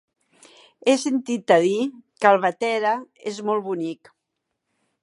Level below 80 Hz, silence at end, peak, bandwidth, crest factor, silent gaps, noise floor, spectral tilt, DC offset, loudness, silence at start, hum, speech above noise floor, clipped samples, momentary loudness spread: -80 dBFS; 1.1 s; -2 dBFS; 11.5 kHz; 22 dB; none; -79 dBFS; -4.5 dB/octave; under 0.1%; -22 LUFS; 0.85 s; none; 58 dB; under 0.1%; 12 LU